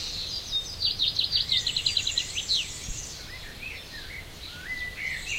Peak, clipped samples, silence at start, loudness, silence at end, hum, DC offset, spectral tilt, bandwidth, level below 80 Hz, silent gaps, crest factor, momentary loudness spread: -10 dBFS; under 0.1%; 0 s; -27 LUFS; 0 s; none; under 0.1%; -0.5 dB/octave; 16 kHz; -46 dBFS; none; 20 dB; 15 LU